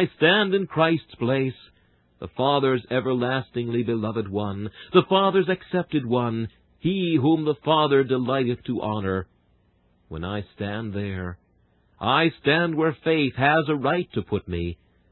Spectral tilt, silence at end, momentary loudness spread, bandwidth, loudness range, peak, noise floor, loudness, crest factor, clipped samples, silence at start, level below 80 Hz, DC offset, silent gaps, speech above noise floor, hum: -11 dB/octave; 0.35 s; 12 LU; 4.3 kHz; 6 LU; -4 dBFS; -63 dBFS; -23 LUFS; 20 dB; under 0.1%; 0 s; -50 dBFS; under 0.1%; none; 40 dB; none